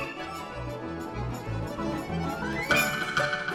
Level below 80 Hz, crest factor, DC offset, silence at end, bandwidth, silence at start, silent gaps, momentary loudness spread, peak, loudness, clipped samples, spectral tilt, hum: -46 dBFS; 20 dB; under 0.1%; 0 s; 19.5 kHz; 0 s; none; 12 LU; -10 dBFS; -30 LUFS; under 0.1%; -4.5 dB/octave; none